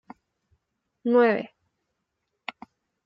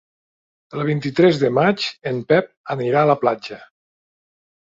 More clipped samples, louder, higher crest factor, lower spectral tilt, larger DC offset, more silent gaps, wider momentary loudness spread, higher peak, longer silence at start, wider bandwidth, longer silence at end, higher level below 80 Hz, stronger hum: neither; second, -23 LUFS vs -19 LUFS; about the same, 18 dB vs 18 dB; about the same, -8 dB/octave vs -7 dB/octave; neither; second, none vs 2.57-2.64 s; first, 20 LU vs 13 LU; second, -10 dBFS vs -2 dBFS; first, 1.05 s vs 0.75 s; second, 5.6 kHz vs 7.8 kHz; first, 1.6 s vs 1.05 s; second, -80 dBFS vs -60 dBFS; neither